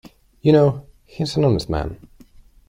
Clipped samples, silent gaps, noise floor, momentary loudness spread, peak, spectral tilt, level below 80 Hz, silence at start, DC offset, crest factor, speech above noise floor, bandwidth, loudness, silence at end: under 0.1%; none; -48 dBFS; 14 LU; -2 dBFS; -7.5 dB/octave; -40 dBFS; 0.45 s; under 0.1%; 18 dB; 30 dB; 11.5 kHz; -19 LUFS; 0.75 s